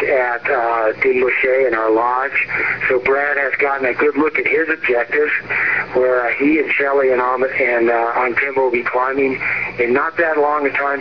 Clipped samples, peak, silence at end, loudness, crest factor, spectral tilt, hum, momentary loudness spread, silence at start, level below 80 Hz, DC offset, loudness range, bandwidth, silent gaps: under 0.1%; -4 dBFS; 0 s; -16 LUFS; 12 dB; -7 dB/octave; none; 3 LU; 0 s; -52 dBFS; 0.4%; 1 LU; 5.4 kHz; none